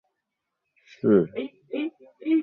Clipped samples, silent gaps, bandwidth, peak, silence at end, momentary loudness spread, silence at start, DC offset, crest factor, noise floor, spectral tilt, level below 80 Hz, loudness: under 0.1%; none; 5.6 kHz; -8 dBFS; 0 s; 14 LU; 1.05 s; under 0.1%; 20 dB; -82 dBFS; -9.5 dB/octave; -68 dBFS; -26 LUFS